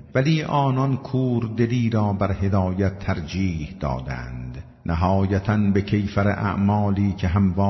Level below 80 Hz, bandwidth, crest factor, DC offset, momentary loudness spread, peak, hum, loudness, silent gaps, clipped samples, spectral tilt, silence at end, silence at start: -42 dBFS; 6.2 kHz; 14 dB; under 0.1%; 8 LU; -8 dBFS; none; -22 LUFS; none; under 0.1%; -8.5 dB/octave; 0 s; 0 s